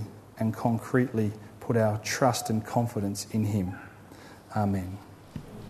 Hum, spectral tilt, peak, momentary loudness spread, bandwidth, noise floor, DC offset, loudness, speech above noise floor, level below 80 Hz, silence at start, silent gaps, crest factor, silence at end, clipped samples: none; -6 dB/octave; -10 dBFS; 18 LU; 13.5 kHz; -49 dBFS; under 0.1%; -29 LUFS; 21 dB; -60 dBFS; 0 s; none; 20 dB; 0 s; under 0.1%